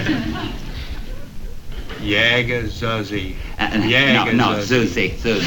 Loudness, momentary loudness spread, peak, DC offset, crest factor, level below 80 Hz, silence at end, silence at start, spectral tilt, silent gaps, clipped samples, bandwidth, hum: -18 LUFS; 21 LU; -2 dBFS; under 0.1%; 18 dB; -32 dBFS; 0 s; 0 s; -5 dB/octave; none; under 0.1%; over 20 kHz; none